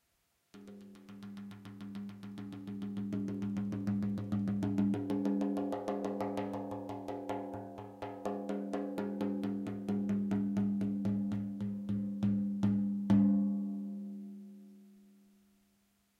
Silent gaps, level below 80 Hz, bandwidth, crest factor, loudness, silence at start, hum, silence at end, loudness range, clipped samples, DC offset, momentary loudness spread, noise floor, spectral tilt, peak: none; -68 dBFS; 9.2 kHz; 18 dB; -36 LUFS; 0.55 s; none; 1.15 s; 7 LU; under 0.1%; under 0.1%; 16 LU; -77 dBFS; -9 dB/octave; -18 dBFS